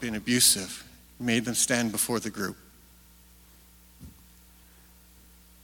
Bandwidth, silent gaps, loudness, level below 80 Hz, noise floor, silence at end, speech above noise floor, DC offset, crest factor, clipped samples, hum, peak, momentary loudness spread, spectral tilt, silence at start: 18 kHz; none; -25 LUFS; -58 dBFS; -55 dBFS; 1.55 s; 28 dB; under 0.1%; 24 dB; under 0.1%; 60 Hz at -55 dBFS; -6 dBFS; 17 LU; -2 dB/octave; 0 s